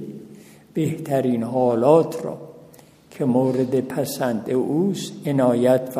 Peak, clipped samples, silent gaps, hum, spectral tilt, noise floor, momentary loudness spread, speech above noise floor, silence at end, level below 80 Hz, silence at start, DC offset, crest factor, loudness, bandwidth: -2 dBFS; under 0.1%; none; none; -7 dB/octave; -48 dBFS; 14 LU; 28 dB; 0 s; -66 dBFS; 0 s; under 0.1%; 18 dB; -21 LUFS; 15.5 kHz